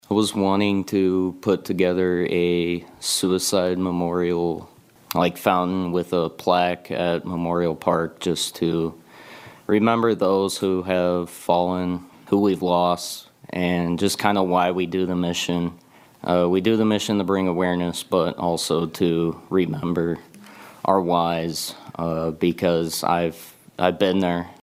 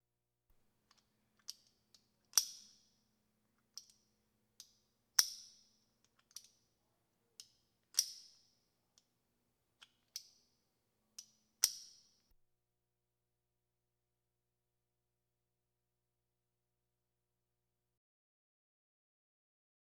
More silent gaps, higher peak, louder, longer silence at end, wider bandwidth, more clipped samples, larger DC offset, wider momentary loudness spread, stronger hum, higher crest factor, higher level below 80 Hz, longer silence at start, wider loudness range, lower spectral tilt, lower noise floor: neither; first, -2 dBFS vs -10 dBFS; first, -22 LUFS vs -36 LUFS; second, 0.1 s vs 8.1 s; about the same, 16 kHz vs 16.5 kHz; neither; neither; second, 7 LU vs 26 LU; second, none vs 60 Hz at -90 dBFS; second, 20 dB vs 40 dB; first, -56 dBFS vs -90 dBFS; second, 0.1 s vs 1.5 s; about the same, 2 LU vs 4 LU; first, -5 dB/octave vs 4 dB/octave; second, -44 dBFS vs -90 dBFS